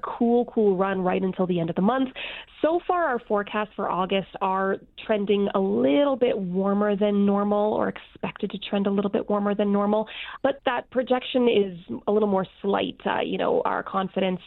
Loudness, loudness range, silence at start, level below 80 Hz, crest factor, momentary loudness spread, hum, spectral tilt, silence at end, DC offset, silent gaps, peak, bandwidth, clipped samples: -24 LUFS; 2 LU; 0.05 s; -58 dBFS; 16 dB; 6 LU; none; -10 dB/octave; 0 s; under 0.1%; none; -8 dBFS; 4.2 kHz; under 0.1%